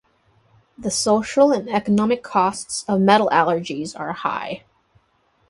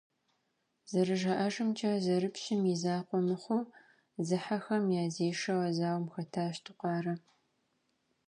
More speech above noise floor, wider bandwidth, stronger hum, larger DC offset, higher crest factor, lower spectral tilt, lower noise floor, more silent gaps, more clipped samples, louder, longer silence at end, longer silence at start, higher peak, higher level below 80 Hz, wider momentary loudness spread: about the same, 44 dB vs 47 dB; about the same, 11.5 kHz vs 10.5 kHz; neither; neither; about the same, 18 dB vs 16 dB; second, -4.5 dB/octave vs -6 dB/octave; second, -63 dBFS vs -80 dBFS; neither; neither; first, -20 LUFS vs -33 LUFS; second, 0.9 s vs 1.1 s; about the same, 0.8 s vs 0.9 s; first, -2 dBFS vs -18 dBFS; first, -58 dBFS vs -80 dBFS; first, 13 LU vs 8 LU